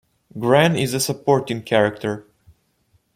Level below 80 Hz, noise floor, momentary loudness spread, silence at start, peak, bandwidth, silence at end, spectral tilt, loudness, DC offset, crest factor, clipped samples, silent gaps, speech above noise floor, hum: -58 dBFS; -63 dBFS; 12 LU; 0.35 s; -2 dBFS; 16.5 kHz; 0.95 s; -5 dB/octave; -19 LUFS; under 0.1%; 18 dB; under 0.1%; none; 45 dB; none